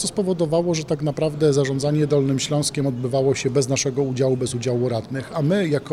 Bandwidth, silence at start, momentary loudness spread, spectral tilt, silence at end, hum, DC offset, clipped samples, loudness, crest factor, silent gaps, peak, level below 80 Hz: 14 kHz; 0 s; 4 LU; -5.5 dB/octave; 0 s; none; under 0.1%; under 0.1%; -21 LUFS; 14 dB; none; -8 dBFS; -52 dBFS